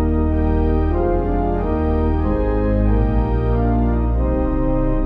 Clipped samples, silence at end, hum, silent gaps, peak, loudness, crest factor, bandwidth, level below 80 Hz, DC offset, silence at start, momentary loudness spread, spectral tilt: under 0.1%; 0 s; none; none; -6 dBFS; -19 LUFS; 10 dB; 4.1 kHz; -20 dBFS; under 0.1%; 0 s; 2 LU; -11.5 dB/octave